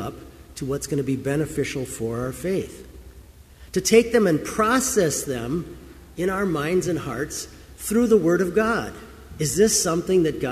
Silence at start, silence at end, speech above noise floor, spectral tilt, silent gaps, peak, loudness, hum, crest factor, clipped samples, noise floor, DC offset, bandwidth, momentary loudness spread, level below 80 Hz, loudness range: 0 s; 0 s; 24 dB; -4.5 dB/octave; none; -2 dBFS; -22 LUFS; none; 20 dB; under 0.1%; -46 dBFS; under 0.1%; 15.5 kHz; 18 LU; -46 dBFS; 6 LU